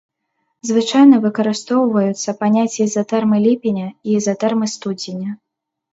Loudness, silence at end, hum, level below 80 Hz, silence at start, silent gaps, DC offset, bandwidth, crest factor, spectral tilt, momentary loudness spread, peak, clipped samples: -16 LUFS; 0.6 s; none; -66 dBFS; 0.65 s; none; under 0.1%; 8 kHz; 16 dB; -5.5 dB/octave; 14 LU; 0 dBFS; under 0.1%